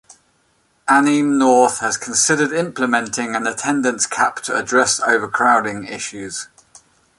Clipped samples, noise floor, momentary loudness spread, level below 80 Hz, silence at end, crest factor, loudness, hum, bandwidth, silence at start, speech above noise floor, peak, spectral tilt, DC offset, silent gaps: under 0.1%; -61 dBFS; 13 LU; -60 dBFS; 0.75 s; 18 dB; -17 LUFS; none; 11.5 kHz; 0.85 s; 44 dB; 0 dBFS; -2.5 dB/octave; under 0.1%; none